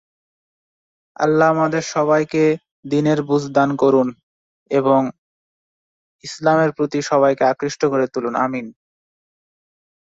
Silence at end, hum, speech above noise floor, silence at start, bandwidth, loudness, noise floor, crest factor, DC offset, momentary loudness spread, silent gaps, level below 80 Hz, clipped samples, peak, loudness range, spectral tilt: 1.35 s; none; over 73 dB; 1.2 s; 8 kHz; -18 LUFS; under -90 dBFS; 18 dB; under 0.1%; 8 LU; 2.71-2.83 s, 4.23-4.66 s, 5.18-6.19 s; -62 dBFS; under 0.1%; -2 dBFS; 3 LU; -6 dB/octave